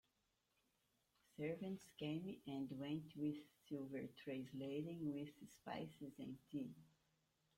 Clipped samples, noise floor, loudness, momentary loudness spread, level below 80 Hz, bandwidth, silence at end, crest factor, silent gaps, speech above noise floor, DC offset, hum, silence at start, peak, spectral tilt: under 0.1%; -86 dBFS; -50 LUFS; 8 LU; -84 dBFS; 16.5 kHz; 0.7 s; 16 dB; none; 37 dB; under 0.1%; none; 1.4 s; -34 dBFS; -7 dB/octave